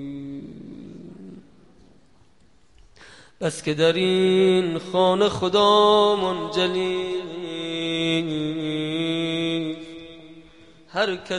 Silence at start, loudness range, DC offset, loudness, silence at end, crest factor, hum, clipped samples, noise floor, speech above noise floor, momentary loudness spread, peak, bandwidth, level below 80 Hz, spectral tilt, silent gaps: 0 s; 9 LU; 0.2%; -22 LUFS; 0 s; 18 dB; none; under 0.1%; -59 dBFS; 39 dB; 23 LU; -6 dBFS; 11.5 kHz; -58 dBFS; -5 dB/octave; none